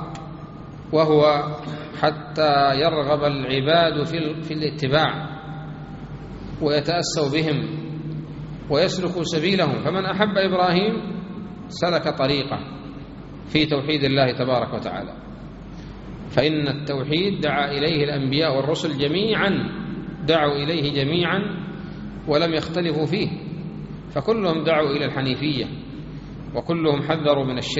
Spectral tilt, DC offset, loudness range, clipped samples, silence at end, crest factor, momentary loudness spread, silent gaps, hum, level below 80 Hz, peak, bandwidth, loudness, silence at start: -4 dB/octave; under 0.1%; 4 LU; under 0.1%; 0 s; 20 dB; 17 LU; none; none; -46 dBFS; -2 dBFS; 8 kHz; -22 LUFS; 0 s